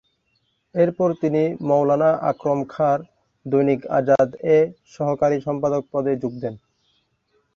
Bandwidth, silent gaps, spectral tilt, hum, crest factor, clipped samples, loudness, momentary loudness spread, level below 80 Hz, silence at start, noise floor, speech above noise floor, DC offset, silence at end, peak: 7.2 kHz; none; -8.5 dB/octave; none; 16 dB; under 0.1%; -21 LUFS; 8 LU; -60 dBFS; 0.75 s; -69 dBFS; 49 dB; under 0.1%; 1 s; -4 dBFS